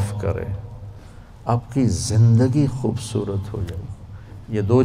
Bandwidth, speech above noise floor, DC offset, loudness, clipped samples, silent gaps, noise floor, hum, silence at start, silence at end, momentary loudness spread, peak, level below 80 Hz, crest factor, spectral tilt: 11 kHz; 21 dB; under 0.1%; -21 LUFS; under 0.1%; none; -41 dBFS; none; 0 s; 0 s; 22 LU; -4 dBFS; -42 dBFS; 16 dB; -7 dB/octave